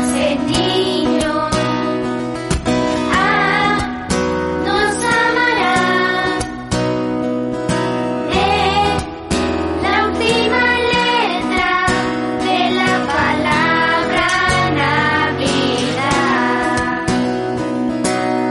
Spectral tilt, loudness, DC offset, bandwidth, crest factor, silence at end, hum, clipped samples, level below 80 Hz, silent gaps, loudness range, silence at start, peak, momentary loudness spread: -4.5 dB/octave; -16 LUFS; under 0.1%; 11.5 kHz; 14 dB; 0 s; none; under 0.1%; -36 dBFS; none; 2 LU; 0 s; -2 dBFS; 6 LU